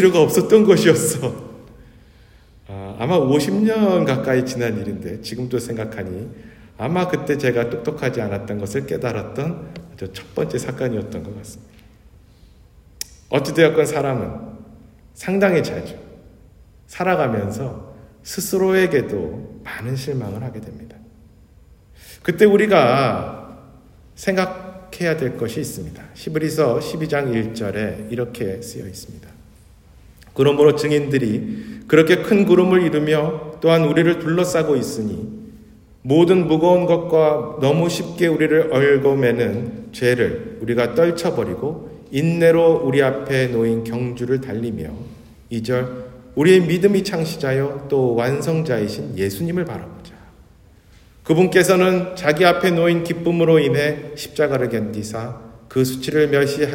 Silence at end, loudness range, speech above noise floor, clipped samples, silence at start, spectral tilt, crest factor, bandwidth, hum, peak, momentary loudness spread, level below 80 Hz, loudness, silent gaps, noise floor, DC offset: 0 s; 8 LU; 31 dB; under 0.1%; 0 s; -6 dB/octave; 18 dB; 16.5 kHz; none; 0 dBFS; 18 LU; -50 dBFS; -18 LUFS; none; -49 dBFS; under 0.1%